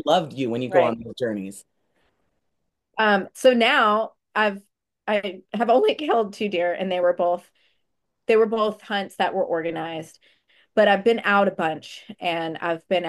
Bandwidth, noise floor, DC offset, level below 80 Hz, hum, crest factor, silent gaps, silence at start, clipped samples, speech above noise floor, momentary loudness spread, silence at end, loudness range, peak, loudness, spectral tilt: 12.5 kHz; -78 dBFS; under 0.1%; -70 dBFS; none; 18 dB; none; 0.05 s; under 0.1%; 56 dB; 13 LU; 0 s; 4 LU; -4 dBFS; -22 LUFS; -5 dB/octave